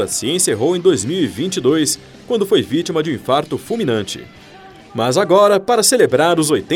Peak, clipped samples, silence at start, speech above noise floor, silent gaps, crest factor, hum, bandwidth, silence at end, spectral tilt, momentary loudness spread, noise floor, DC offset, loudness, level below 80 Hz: 0 dBFS; under 0.1%; 0 s; 24 dB; none; 14 dB; none; 17 kHz; 0 s; -4 dB/octave; 10 LU; -40 dBFS; under 0.1%; -15 LUFS; -54 dBFS